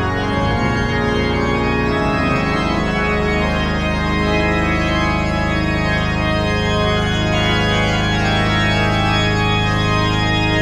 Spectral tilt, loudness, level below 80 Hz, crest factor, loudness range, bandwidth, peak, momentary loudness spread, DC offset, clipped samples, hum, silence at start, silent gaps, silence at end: -5.5 dB/octave; -17 LUFS; -26 dBFS; 12 dB; 1 LU; 11 kHz; -4 dBFS; 2 LU; under 0.1%; under 0.1%; none; 0 s; none; 0 s